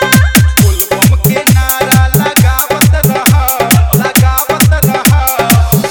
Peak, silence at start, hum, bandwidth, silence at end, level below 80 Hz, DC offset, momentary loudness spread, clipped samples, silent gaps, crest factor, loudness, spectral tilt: 0 dBFS; 0 s; none; over 20 kHz; 0 s; -16 dBFS; under 0.1%; 2 LU; 0.8%; none; 8 dB; -8 LUFS; -4.5 dB/octave